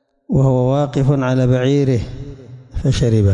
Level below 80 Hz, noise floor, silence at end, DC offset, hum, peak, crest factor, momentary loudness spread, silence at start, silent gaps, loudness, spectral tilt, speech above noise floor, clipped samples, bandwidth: -34 dBFS; -35 dBFS; 0 s; under 0.1%; none; -4 dBFS; 10 dB; 16 LU; 0.3 s; none; -16 LUFS; -8 dB/octave; 21 dB; under 0.1%; 9.8 kHz